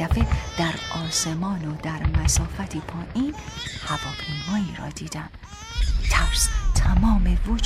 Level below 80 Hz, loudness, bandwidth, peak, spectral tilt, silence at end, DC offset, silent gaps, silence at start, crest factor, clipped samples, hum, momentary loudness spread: -26 dBFS; -25 LUFS; 15.5 kHz; -6 dBFS; -4 dB/octave; 0 s; under 0.1%; none; 0 s; 18 dB; under 0.1%; none; 12 LU